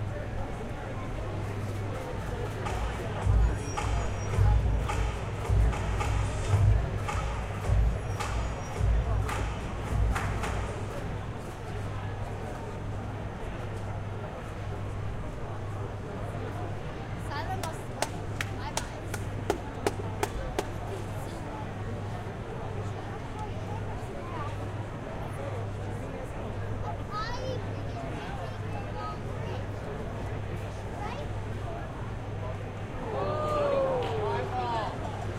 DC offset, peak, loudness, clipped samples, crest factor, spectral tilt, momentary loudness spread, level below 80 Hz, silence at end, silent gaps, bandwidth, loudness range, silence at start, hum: under 0.1%; -10 dBFS; -33 LUFS; under 0.1%; 22 dB; -6 dB/octave; 9 LU; -36 dBFS; 0 s; none; 15 kHz; 8 LU; 0 s; none